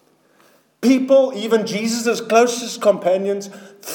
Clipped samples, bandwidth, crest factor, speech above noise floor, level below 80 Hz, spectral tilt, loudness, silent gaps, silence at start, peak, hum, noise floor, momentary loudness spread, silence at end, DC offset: under 0.1%; 19 kHz; 16 dB; 38 dB; -76 dBFS; -4 dB/octave; -18 LUFS; none; 0.8 s; -2 dBFS; none; -55 dBFS; 10 LU; 0 s; under 0.1%